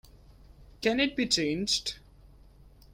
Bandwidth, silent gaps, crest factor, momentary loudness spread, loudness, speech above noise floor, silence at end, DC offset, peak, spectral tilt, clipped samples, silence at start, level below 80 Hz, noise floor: 16.5 kHz; none; 22 dB; 9 LU; -28 LUFS; 26 dB; 0.25 s; under 0.1%; -12 dBFS; -3 dB/octave; under 0.1%; 0.15 s; -54 dBFS; -55 dBFS